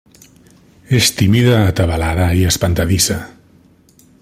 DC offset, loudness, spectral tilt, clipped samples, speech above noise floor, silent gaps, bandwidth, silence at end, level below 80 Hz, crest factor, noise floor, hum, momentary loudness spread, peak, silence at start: under 0.1%; -14 LUFS; -4.5 dB/octave; under 0.1%; 36 dB; none; 16.5 kHz; 0.95 s; -34 dBFS; 16 dB; -49 dBFS; none; 5 LU; 0 dBFS; 0.9 s